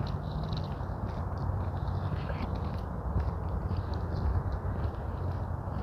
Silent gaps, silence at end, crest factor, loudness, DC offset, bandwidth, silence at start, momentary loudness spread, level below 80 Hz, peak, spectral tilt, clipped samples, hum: none; 0 s; 14 dB; -35 LUFS; under 0.1%; 6.2 kHz; 0 s; 3 LU; -38 dBFS; -20 dBFS; -9 dB/octave; under 0.1%; none